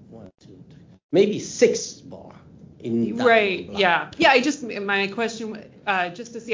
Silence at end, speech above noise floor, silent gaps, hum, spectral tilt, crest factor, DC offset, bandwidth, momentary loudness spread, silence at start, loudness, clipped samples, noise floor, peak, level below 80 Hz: 0 s; 26 dB; 1.03-1.09 s; none; -4 dB/octave; 20 dB; under 0.1%; 7.6 kHz; 16 LU; 0.1 s; -21 LUFS; under 0.1%; -48 dBFS; -4 dBFS; -60 dBFS